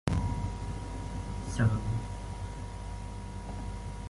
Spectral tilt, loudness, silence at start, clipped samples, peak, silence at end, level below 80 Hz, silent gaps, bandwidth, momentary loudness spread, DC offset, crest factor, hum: -6.5 dB/octave; -36 LUFS; 0.05 s; under 0.1%; -12 dBFS; 0 s; -40 dBFS; none; 11.5 kHz; 12 LU; under 0.1%; 22 dB; none